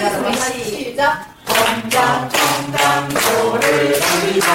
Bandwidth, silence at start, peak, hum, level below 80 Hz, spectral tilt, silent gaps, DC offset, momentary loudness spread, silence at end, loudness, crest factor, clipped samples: 16.5 kHz; 0 s; -2 dBFS; none; -48 dBFS; -2.5 dB/octave; none; under 0.1%; 5 LU; 0 s; -16 LUFS; 14 dB; under 0.1%